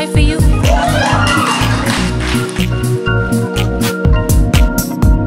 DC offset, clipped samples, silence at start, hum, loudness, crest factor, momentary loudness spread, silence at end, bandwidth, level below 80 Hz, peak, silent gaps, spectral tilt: 1%; under 0.1%; 0 s; none; -13 LUFS; 12 dB; 4 LU; 0 s; 16.5 kHz; -16 dBFS; 0 dBFS; none; -5.5 dB/octave